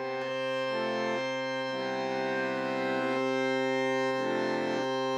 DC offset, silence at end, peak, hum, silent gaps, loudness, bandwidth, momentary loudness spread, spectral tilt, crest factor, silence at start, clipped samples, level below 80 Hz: under 0.1%; 0 s; -18 dBFS; none; none; -31 LUFS; 11.5 kHz; 4 LU; -4.5 dB/octave; 12 dB; 0 s; under 0.1%; -78 dBFS